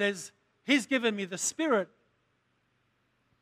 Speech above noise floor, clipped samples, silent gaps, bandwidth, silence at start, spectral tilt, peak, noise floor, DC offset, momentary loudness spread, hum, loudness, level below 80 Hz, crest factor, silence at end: 45 dB; under 0.1%; none; 15.5 kHz; 0 s; -2.5 dB/octave; -12 dBFS; -74 dBFS; under 0.1%; 16 LU; none; -29 LUFS; -82 dBFS; 22 dB; 1.55 s